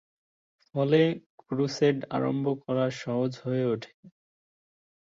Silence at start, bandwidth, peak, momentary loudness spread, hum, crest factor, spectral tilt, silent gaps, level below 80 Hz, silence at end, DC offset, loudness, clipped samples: 0.75 s; 7.6 kHz; -10 dBFS; 11 LU; none; 18 dB; -7 dB/octave; 1.26-1.38 s, 3.94-4.03 s; -70 dBFS; 1 s; under 0.1%; -28 LUFS; under 0.1%